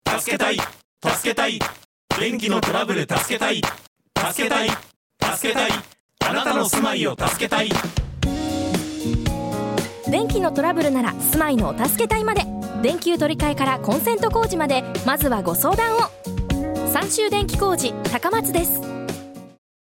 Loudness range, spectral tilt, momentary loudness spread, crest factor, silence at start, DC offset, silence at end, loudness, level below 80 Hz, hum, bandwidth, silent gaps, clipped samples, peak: 2 LU; -4 dB/octave; 6 LU; 16 dB; 0.05 s; under 0.1%; 0.5 s; -21 LUFS; -38 dBFS; none; 17 kHz; 0.84-0.97 s, 1.85-2.08 s, 3.87-3.96 s, 4.96-5.10 s, 6.00-6.09 s; under 0.1%; -4 dBFS